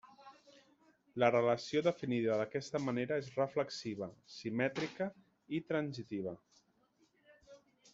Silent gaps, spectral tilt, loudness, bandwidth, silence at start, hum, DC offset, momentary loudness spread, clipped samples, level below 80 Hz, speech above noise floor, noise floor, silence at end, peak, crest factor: none; -5 dB/octave; -37 LUFS; 8 kHz; 0.05 s; none; under 0.1%; 12 LU; under 0.1%; -78 dBFS; 38 dB; -74 dBFS; 0.35 s; -14 dBFS; 24 dB